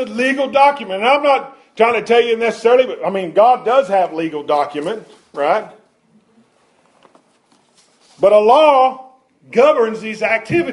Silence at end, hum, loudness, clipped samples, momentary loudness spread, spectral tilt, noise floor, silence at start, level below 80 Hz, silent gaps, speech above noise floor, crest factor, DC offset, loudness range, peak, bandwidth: 0 s; none; -14 LUFS; under 0.1%; 10 LU; -5 dB/octave; -56 dBFS; 0 s; -62 dBFS; none; 42 dB; 14 dB; under 0.1%; 9 LU; -2 dBFS; 11.5 kHz